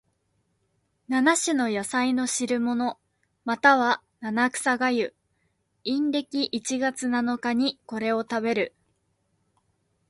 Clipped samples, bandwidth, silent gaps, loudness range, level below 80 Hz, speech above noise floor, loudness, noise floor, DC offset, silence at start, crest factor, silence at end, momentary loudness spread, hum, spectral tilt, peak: under 0.1%; 11.5 kHz; none; 4 LU; -70 dBFS; 48 dB; -25 LUFS; -72 dBFS; under 0.1%; 1.1 s; 22 dB; 1.4 s; 9 LU; none; -2.5 dB/octave; -4 dBFS